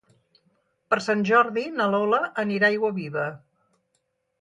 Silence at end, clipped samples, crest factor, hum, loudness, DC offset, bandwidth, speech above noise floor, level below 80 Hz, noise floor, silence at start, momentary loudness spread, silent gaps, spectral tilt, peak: 1.05 s; under 0.1%; 18 dB; none; -23 LUFS; under 0.1%; 11 kHz; 51 dB; -74 dBFS; -74 dBFS; 0.9 s; 9 LU; none; -6 dB/octave; -6 dBFS